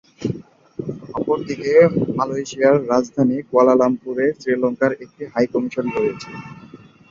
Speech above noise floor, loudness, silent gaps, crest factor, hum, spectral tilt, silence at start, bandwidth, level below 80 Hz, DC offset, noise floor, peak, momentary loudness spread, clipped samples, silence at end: 25 dB; -19 LUFS; none; 16 dB; none; -7 dB/octave; 0.2 s; 7.6 kHz; -58 dBFS; under 0.1%; -43 dBFS; -2 dBFS; 17 LU; under 0.1%; 0.35 s